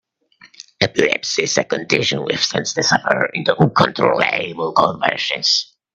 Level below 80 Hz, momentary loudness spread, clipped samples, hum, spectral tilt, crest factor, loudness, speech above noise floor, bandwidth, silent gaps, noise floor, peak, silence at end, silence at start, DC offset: -58 dBFS; 4 LU; under 0.1%; none; -3.5 dB/octave; 18 dB; -17 LUFS; 33 dB; 9.2 kHz; none; -51 dBFS; 0 dBFS; 0.3 s; 0.45 s; under 0.1%